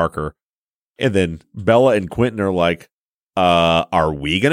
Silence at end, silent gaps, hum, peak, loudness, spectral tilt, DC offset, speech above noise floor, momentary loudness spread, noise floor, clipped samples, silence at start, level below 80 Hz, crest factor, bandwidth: 0 s; 0.42-0.69 s, 0.75-0.94 s, 2.93-3.29 s; none; -2 dBFS; -17 LUFS; -6 dB/octave; under 0.1%; over 73 dB; 11 LU; under -90 dBFS; under 0.1%; 0 s; -42 dBFS; 16 dB; 15.5 kHz